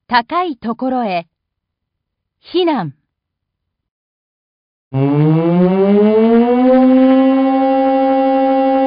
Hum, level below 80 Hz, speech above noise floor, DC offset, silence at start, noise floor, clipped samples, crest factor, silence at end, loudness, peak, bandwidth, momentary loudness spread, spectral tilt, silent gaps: none; -54 dBFS; 63 dB; under 0.1%; 0.1 s; -76 dBFS; under 0.1%; 14 dB; 0 s; -13 LUFS; 0 dBFS; 5.2 kHz; 11 LU; -12.5 dB/octave; 3.91-4.91 s